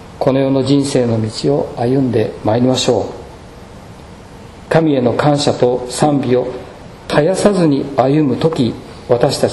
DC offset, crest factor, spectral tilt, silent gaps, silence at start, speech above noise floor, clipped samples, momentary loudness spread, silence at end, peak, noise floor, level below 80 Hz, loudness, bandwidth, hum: under 0.1%; 14 dB; -6 dB/octave; none; 0 s; 22 dB; 0.1%; 6 LU; 0 s; 0 dBFS; -35 dBFS; -42 dBFS; -14 LUFS; 12 kHz; none